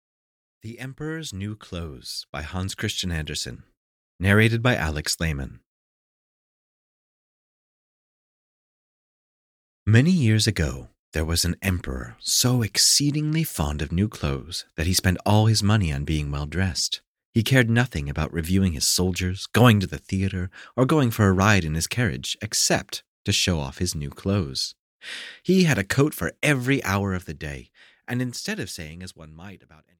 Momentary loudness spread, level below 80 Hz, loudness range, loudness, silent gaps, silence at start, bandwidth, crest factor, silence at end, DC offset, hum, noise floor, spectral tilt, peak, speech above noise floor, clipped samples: 15 LU; -40 dBFS; 8 LU; -23 LUFS; 2.29-2.33 s, 3.77-4.19 s, 5.66-9.86 s, 10.99-11.12 s, 17.07-17.15 s, 17.25-17.33 s, 23.08-23.25 s, 24.79-25.00 s; 0.65 s; 17 kHz; 20 dB; 0.45 s; under 0.1%; none; under -90 dBFS; -4.5 dB/octave; -4 dBFS; over 67 dB; under 0.1%